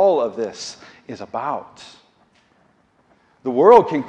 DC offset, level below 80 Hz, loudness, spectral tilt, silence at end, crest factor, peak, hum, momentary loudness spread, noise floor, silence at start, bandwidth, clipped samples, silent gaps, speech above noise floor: under 0.1%; -62 dBFS; -18 LUFS; -5.5 dB/octave; 0 s; 20 dB; 0 dBFS; none; 25 LU; -59 dBFS; 0 s; 9.2 kHz; under 0.1%; none; 41 dB